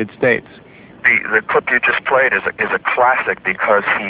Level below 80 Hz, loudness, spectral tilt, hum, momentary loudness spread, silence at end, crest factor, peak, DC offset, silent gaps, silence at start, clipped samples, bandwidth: -54 dBFS; -15 LUFS; -7.5 dB/octave; none; 4 LU; 0 s; 16 dB; 0 dBFS; under 0.1%; none; 0 s; under 0.1%; 4 kHz